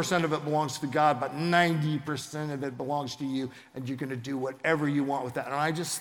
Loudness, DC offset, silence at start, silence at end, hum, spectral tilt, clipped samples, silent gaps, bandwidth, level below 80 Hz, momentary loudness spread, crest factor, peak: -29 LUFS; under 0.1%; 0 s; 0 s; none; -5 dB/octave; under 0.1%; none; 17.5 kHz; -72 dBFS; 10 LU; 22 dB; -8 dBFS